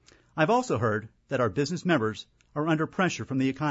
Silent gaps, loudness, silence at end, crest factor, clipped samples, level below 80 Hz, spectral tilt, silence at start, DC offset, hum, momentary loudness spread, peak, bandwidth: none; -27 LUFS; 0 s; 18 dB; under 0.1%; -64 dBFS; -6 dB/octave; 0.35 s; under 0.1%; none; 9 LU; -10 dBFS; 8 kHz